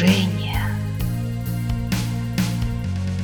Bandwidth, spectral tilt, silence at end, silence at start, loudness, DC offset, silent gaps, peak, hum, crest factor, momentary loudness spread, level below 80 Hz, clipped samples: over 20 kHz; -6 dB/octave; 0 s; 0 s; -24 LUFS; under 0.1%; none; -4 dBFS; none; 18 dB; 4 LU; -34 dBFS; under 0.1%